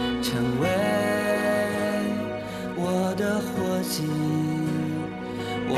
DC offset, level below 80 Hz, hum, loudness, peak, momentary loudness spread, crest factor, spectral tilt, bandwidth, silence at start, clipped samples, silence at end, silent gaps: under 0.1%; -52 dBFS; none; -26 LUFS; -10 dBFS; 7 LU; 14 dB; -5.5 dB/octave; 14 kHz; 0 s; under 0.1%; 0 s; none